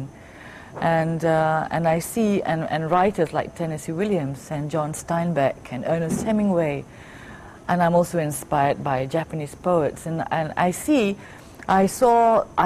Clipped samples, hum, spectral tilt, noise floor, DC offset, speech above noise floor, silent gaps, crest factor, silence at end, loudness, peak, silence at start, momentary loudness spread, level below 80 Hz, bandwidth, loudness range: under 0.1%; none; -6 dB/octave; -42 dBFS; under 0.1%; 20 dB; none; 16 dB; 0 s; -22 LUFS; -6 dBFS; 0 s; 16 LU; -50 dBFS; 15.5 kHz; 3 LU